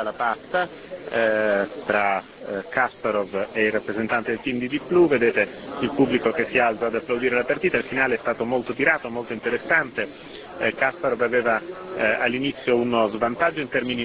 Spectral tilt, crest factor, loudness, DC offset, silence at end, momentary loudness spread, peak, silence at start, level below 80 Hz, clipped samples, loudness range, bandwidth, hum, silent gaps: -9 dB/octave; 18 dB; -23 LUFS; under 0.1%; 0 s; 8 LU; -4 dBFS; 0 s; -58 dBFS; under 0.1%; 2 LU; 4 kHz; none; none